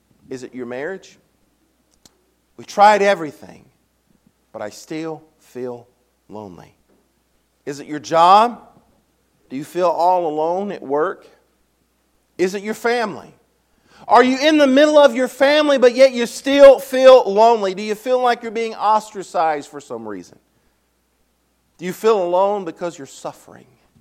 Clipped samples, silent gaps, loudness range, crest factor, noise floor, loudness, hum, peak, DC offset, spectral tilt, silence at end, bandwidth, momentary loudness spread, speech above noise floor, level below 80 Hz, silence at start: 0.1%; none; 16 LU; 18 dB; -64 dBFS; -15 LUFS; none; 0 dBFS; under 0.1%; -4 dB/octave; 0.7 s; 15.5 kHz; 22 LU; 48 dB; -60 dBFS; 0.3 s